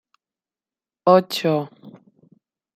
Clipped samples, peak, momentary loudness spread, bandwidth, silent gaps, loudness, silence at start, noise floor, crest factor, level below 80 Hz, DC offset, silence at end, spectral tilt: under 0.1%; -2 dBFS; 10 LU; 16 kHz; none; -19 LUFS; 1.05 s; under -90 dBFS; 20 dB; -72 dBFS; under 0.1%; 0.85 s; -6 dB/octave